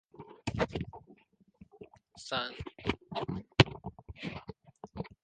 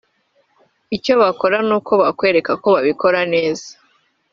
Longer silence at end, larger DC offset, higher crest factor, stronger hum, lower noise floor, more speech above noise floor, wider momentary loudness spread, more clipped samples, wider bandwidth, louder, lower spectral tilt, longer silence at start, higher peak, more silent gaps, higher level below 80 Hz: second, 0.15 s vs 0.6 s; neither; first, 32 dB vs 16 dB; neither; about the same, -64 dBFS vs -62 dBFS; second, 27 dB vs 46 dB; first, 26 LU vs 9 LU; neither; first, 9.6 kHz vs 7.6 kHz; second, -34 LUFS vs -16 LUFS; first, -5.5 dB/octave vs -3 dB/octave; second, 0.2 s vs 0.9 s; about the same, -4 dBFS vs -2 dBFS; neither; first, -52 dBFS vs -60 dBFS